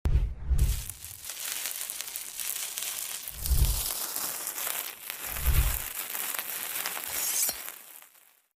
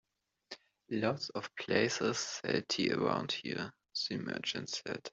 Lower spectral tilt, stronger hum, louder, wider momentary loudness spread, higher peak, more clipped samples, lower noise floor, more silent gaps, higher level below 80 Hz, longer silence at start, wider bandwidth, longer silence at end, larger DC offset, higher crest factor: second, -2 dB/octave vs -3.5 dB/octave; neither; first, -31 LUFS vs -35 LUFS; about the same, 9 LU vs 10 LU; first, -8 dBFS vs -14 dBFS; neither; first, -60 dBFS vs -56 dBFS; neither; first, -34 dBFS vs -74 dBFS; second, 0.05 s vs 0.5 s; first, 16 kHz vs 8.2 kHz; first, 0.5 s vs 0.05 s; neither; about the same, 22 dB vs 24 dB